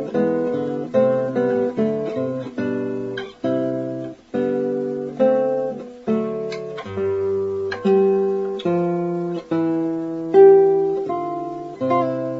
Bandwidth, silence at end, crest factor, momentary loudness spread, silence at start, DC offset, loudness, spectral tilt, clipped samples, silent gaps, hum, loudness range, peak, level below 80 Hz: 7.2 kHz; 0 s; 18 dB; 11 LU; 0 s; under 0.1%; -21 LUFS; -8.5 dB/octave; under 0.1%; none; none; 6 LU; -2 dBFS; -62 dBFS